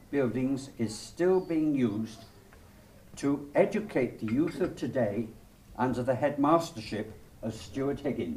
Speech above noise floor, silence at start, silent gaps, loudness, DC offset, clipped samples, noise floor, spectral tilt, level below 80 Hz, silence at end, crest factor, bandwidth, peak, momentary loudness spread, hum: 24 dB; 0.1 s; none; -30 LUFS; under 0.1%; under 0.1%; -54 dBFS; -6.5 dB/octave; -56 dBFS; 0 s; 20 dB; 15.5 kHz; -10 dBFS; 13 LU; none